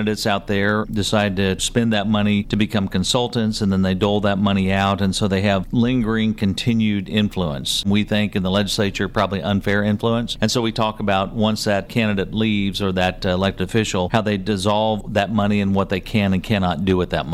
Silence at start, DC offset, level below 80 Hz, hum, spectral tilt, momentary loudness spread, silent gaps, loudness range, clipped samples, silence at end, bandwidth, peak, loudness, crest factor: 0 s; under 0.1%; -38 dBFS; none; -5.5 dB/octave; 2 LU; none; 1 LU; under 0.1%; 0 s; 14.5 kHz; -6 dBFS; -20 LUFS; 14 dB